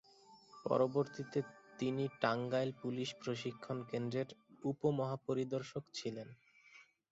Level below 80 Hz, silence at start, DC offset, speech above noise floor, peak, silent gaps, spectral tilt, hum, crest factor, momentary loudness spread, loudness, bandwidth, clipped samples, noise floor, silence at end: -78 dBFS; 0.3 s; under 0.1%; 26 dB; -18 dBFS; none; -5.5 dB/octave; none; 22 dB; 10 LU; -39 LUFS; 8 kHz; under 0.1%; -64 dBFS; 0.3 s